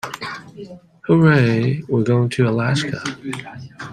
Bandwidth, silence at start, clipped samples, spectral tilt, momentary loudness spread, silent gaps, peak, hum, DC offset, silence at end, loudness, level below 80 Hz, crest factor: 12.5 kHz; 0.05 s; under 0.1%; -7 dB/octave; 22 LU; none; -2 dBFS; none; under 0.1%; 0 s; -18 LUFS; -54 dBFS; 18 dB